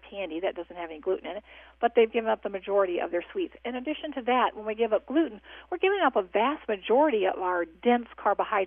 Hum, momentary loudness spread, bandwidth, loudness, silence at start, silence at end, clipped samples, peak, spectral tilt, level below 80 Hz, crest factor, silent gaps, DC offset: none; 11 LU; 3.7 kHz; -27 LUFS; 0.05 s; 0 s; under 0.1%; -10 dBFS; -8 dB/octave; -62 dBFS; 18 dB; none; under 0.1%